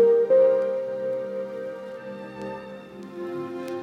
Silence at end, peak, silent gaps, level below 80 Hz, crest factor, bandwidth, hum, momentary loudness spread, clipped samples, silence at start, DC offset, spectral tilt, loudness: 0 s; -10 dBFS; none; -70 dBFS; 14 dB; 6.6 kHz; none; 19 LU; under 0.1%; 0 s; under 0.1%; -7 dB/octave; -25 LUFS